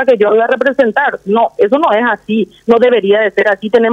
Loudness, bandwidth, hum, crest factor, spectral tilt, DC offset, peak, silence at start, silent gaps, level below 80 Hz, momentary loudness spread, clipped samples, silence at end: -11 LUFS; 7.6 kHz; none; 10 dB; -6.5 dB/octave; under 0.1%; 0 dBFS; 0 s; none; -56 dBFS; 4 LU; under 0.1%; 0 s